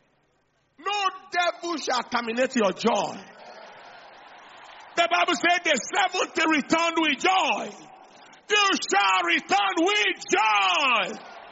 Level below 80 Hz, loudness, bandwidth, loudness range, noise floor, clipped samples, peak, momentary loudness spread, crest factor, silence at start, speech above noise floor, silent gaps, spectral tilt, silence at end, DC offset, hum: -72 dBFS; -23 LUFS; 8 kHz; 6 LU; -68 dBFS; under 0.1%; -8 dBFS; 9 LU; 18 dB; 0.8 s; 45 dB; none; 0 dB/octave; 0 s; under 0.1%; none